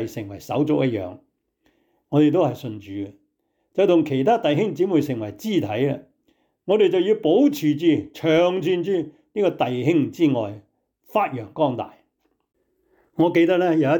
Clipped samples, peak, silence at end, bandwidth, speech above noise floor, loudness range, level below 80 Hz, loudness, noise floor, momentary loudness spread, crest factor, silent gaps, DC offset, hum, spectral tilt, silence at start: under 0.1%; -8 dBFS; 0 s; 19 kHz; 51 dB; 4 LU; -66 dBFS; -21 LUFS; -72 dBFS; 14 LU; 14 dB; none; under 0.1%; none; -7 dB/octave; 0 s